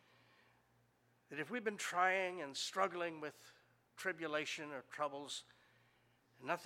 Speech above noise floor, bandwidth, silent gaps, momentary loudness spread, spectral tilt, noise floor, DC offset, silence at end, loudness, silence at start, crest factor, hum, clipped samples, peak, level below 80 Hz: 34 dB; 16.5 kHz; none; 14 LU; -2.5 dB/octave; -75 dBFS; under 0.1%; 0 s; -41 LUFS; 1.3 s; 24 dB; none; under 0.1%; -20 dBFS; under -90 dBFS